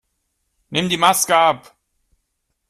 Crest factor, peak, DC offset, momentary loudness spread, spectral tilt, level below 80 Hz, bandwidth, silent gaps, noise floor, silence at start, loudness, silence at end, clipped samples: 20 dB; 0 dBFS; under 0.1%; 10 LU; -2.5 dB/octave; -60 dBFS; 15 kHz; none; -73 dBFS; 0.7 s; -16 LUFS; 1.15 s; under 0.1%